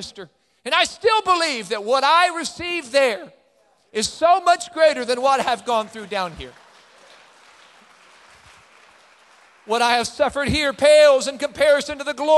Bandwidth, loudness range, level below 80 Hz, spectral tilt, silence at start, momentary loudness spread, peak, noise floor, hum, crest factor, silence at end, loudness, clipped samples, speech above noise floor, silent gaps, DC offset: 12.5 kHz; 11 LU; -50 dBFS; -2.5 dB/octave; 0 s; 12 LU; -2 dBFS; -60 dBFS; none; 18 dB; 0 s; -19 LUFS; under 0.1%; 41 dB; none; under 0.1%